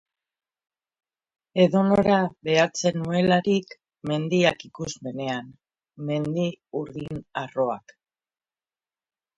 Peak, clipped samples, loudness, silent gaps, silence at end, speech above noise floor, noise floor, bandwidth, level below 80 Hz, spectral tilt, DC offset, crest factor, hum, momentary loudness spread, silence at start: -6 dBFS; under 0.1%; -24 LUFS; none; 1.6 s; over 66 dB; under -90 dBFS; 8 kHz; -60 dBFS; -5.5 dB/octave; under 0.1%; 20 dB; none; 14 LU; 1.55 s